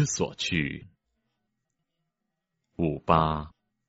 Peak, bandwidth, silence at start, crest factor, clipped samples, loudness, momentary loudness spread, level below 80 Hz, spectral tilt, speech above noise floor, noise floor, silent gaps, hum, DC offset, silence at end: -4 dBFS; 8 kHz; 0 s; 26 dB; under 0.1%; -27 LUFS; 13 LU; -48 dBFS; -4.5 dB/octave; 55 dB; -83 dBFS; none; none; under 0.1%; 0.4 s